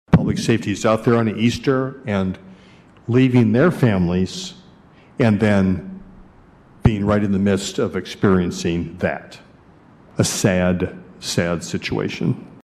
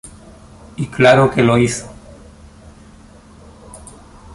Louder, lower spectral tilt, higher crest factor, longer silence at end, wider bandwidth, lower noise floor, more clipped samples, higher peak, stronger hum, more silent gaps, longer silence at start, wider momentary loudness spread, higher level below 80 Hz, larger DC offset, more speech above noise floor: second, -19 LUFS vs -14 LUFS; about the same, -6 dB/octave vs -5.5 dB/octave; about the same, 18 dB vs 18 dB; about the same, 0.1 s vs 0 s; first, 14.5 kHz vs 11.5 kHz; first, -48 dBFS vs -42 dBFS; neither; about the same, -2 dBFS vs 0 dBFS; neither; neither; about the same, 0.1 s vs 0.05 s; second, 12 LU vs 27 LU; about the same, -42 dBFS vs -44 dBFS; neither; about the same, 30 dB vs 29 dB